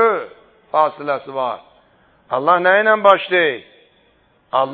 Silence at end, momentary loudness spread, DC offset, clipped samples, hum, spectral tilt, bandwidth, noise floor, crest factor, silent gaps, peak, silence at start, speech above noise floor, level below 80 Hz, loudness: 0 s; 12 LU; under 0.1%; under 0.1%; none; -6.5 dB/octave; 4.7 kHz; -57 dBFS; 18 dB; none; 0 dBFS; 0 s; 41 dB; -68 dBFS; -16 LUFS